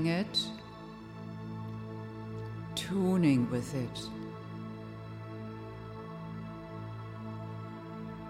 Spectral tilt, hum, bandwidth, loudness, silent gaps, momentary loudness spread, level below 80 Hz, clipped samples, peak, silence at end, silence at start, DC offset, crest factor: -6 dB/octave; none; 16 kHz; -36 LUFS; none; 15 LU; -60 dBFS; under 0.1%; -16 dBFS; 0 s; 0 s; under 0.1%; 20 dB